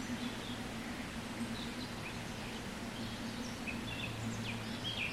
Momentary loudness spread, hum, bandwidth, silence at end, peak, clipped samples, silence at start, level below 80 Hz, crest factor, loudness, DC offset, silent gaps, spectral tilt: 3 LU; none; 16 kHz; 0 s; -26 dBFS; under 0.1%; 0 s; -56 dBFS; 16 dB; -41 LUFS; under 0.1%; none; -4 dB/octave